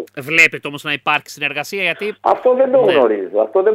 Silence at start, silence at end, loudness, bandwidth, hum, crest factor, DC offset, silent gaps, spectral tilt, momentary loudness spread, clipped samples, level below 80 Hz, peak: 0 s; 0 s; -15 LUFS; 16 kHz; none; 16 dB; under 0.1%; none; -4 dB/octave; 9 LU; under 0.1%; -64 dBFS; 0 dBFS